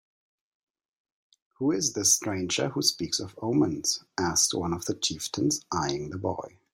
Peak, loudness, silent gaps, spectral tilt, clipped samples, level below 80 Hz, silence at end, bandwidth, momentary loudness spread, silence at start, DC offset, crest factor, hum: -8 dBFS; -27 LUFS; none; -3 dB/octave; under 0.1%; -60 dBFS; 0.25 s; 16 kHz; 8 LU; 1.6 s; under 0.1%; 20 dB; none